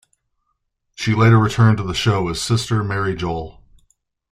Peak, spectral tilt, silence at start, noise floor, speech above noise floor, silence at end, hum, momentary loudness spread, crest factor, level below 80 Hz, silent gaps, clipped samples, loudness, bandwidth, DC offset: -2 dBFS; -6 dB/octave; 1 s; -72 dBFS; 55 dB; 0.8 s; none; 12 LU; 16 dB; -44 dBFS; none; under 0.1%; -18 LUFS; 12.5 kHz; under 0.1%